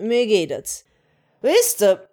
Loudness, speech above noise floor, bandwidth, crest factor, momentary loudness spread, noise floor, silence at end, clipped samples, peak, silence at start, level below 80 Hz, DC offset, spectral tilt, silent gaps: -19 LUFS; 44 dB; over 20 kHz; 16 dB; 13 LU; -63 dBFS; 0.1 s; under 0.1%; -4 dBFS; 0 s; -66 dBFS; under 0.1%; -2.5 dB/octave; none